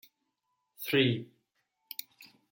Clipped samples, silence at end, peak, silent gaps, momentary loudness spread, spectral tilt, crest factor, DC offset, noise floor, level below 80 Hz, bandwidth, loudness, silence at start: under 0.1%; 0.25 s; -14 dBFS; none; 16 LU; -5.5 dB/octave; 22 dB; under 0.1%; -81 dBFS; -78 dBFS; 17 kHz; -32 LUFS; 0.8 s